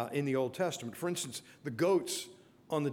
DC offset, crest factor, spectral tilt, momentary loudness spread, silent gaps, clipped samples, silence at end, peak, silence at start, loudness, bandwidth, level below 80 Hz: under 0.1%; 16 dB; -4.5 dB/octave; 12 LU; none; under 0.1%; 0 s; -18 dBFS; 0 s; -35 LUFS; 19.5 kHz; -78 dBFS